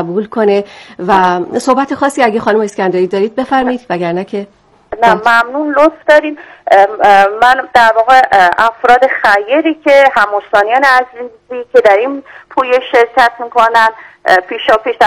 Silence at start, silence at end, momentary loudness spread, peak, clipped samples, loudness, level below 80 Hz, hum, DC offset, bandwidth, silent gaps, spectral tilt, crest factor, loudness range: 0 s; 0 s; 12 LU; 0 dBFS; 3%; -10 LUFS; -48 dBFS; none; under 0.1%; 16.5 kHz; none; -4.5 dB/octave; 10 dB; 5 LU